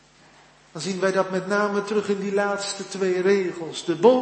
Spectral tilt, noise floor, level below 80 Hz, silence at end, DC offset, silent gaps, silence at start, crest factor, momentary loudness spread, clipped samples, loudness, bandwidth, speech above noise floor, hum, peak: -4.5 dB/octave; -53 dBFS; -68 dBFS; 0 s; under 0.1%; none; 0.75 s; 20 dB; 10 LU; under 0.1%; -24 LUFS; 8.8 kHz; 31 dB; none; -4 dBFS